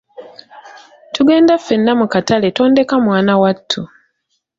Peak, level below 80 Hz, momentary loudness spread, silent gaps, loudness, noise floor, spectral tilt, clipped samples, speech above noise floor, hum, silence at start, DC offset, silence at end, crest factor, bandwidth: -2 dBFS; -54 dBFS; 10 LU; none; -13 LUFS; -68 dBFS; -6 dB/octave; under 0.1%; 56 dB; none; 0.2 s; under 0.1%; 0.7 s; 14 dB; 7.8 kHz